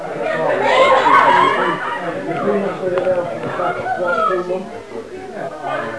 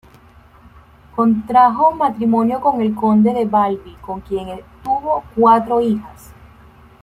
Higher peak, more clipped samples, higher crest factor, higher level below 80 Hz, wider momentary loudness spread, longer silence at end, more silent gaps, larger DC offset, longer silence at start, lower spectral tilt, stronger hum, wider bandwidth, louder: about the same, 0 dBFS vs -2 dBFS; neither; about the same, 18 dB vs 16 dB; second, -54 dBFS vs -48 dBFS; about the same, 17 LU vs 15 LU; second, 0 s vs 0.7 s; neither; first, 0.6% vs under 0.1%; second, 0 s vs 1.15 s; second, -5 dB/octave vs -8 dB/octave; neither; second, 11 kHz vs 13.5 kHz; about the same, -16 LUFS vs -16 LUFS